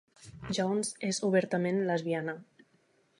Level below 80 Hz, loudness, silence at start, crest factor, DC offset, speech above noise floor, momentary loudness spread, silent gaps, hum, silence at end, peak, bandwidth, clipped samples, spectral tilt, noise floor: -68 dBFS; -31 LUFS; 0.2 s; 20 dB; under 0.1%; 39 dB; 11 LU; none; none; 0.75 s; -12 dBFS; 11.5 kHz; under 0.1%; -5 dB/octave; -69 dBFS